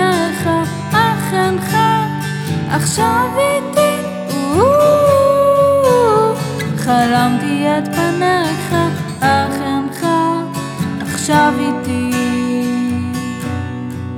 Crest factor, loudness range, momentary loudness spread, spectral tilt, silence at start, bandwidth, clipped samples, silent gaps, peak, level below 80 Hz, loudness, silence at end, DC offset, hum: 14 dB; 4 LU; 10 LU; -5.5 dB/octave; 0 s; 18 kHz; under 0.1%; none; 0 dBFS; -48 dBFS; -15 LUFS; 0 s; under 0.1%; none